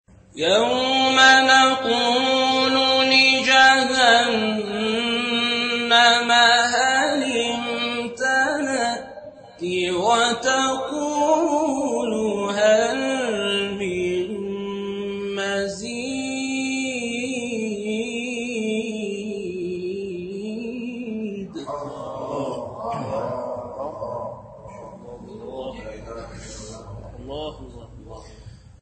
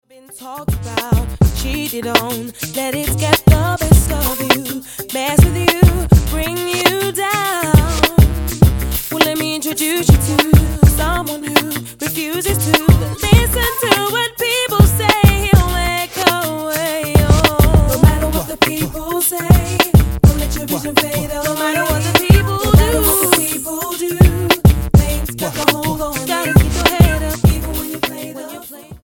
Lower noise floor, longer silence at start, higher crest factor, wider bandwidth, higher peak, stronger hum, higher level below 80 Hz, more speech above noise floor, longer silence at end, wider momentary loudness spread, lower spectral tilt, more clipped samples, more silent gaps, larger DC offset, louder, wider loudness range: first, -43 dBFS vs -34 dBFS; about the same, 0.35 s vs 0.3 s; about the same, 18 dB vs 14 dB; second, 8.8 kHz vs 17.5 kHz; about the same, -2 dBFS vs 0 dBFS; neither; second, -52 dBFS vs -20 dBFS; first, 27 dB vs 20 dB; first, 0.25 s vs 0.05 s; first, 21 LU vs 9 LU; second, -2.5 dB/octave vs -5 dB/octave; neither; neither; neither; second, -20 LUFS vs -14 LUFS; first, 17 LU vs 2 LU